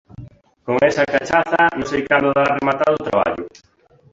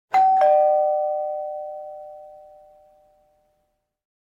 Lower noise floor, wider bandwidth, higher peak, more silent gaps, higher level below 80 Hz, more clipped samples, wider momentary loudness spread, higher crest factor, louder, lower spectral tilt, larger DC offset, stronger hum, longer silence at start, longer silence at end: second, -40 dBFS vs -72 dBFS; about the same, 7.8 kHz vs 7.2 kHz; first, 0 dBFS vs -8 dBFS; neither; first, -50 dBFS vs -72 dBFS; neither; second, 7 LU vs 23 LU; about the same, 18 dB vs 16 dB; first, -17 LUFS vs -20 LUFS; first, -5.5 dB/octave vs -3.5 dB/octave; neither; neither; about the same, 0.2 s vs 0.1 s; second, 0.65 s vs 2 s